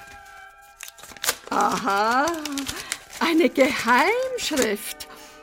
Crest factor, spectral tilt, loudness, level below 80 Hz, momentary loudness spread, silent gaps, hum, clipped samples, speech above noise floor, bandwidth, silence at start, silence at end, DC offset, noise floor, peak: 20 dB; -2.5 dB/octave; -22 LUFS; -56 dBFS; 20 LU; none; none; under 0.1%; 24 dB; 16.5 kHz; 0 s; 0 s; under 0.1%; -46 dBFS; -4 dBFS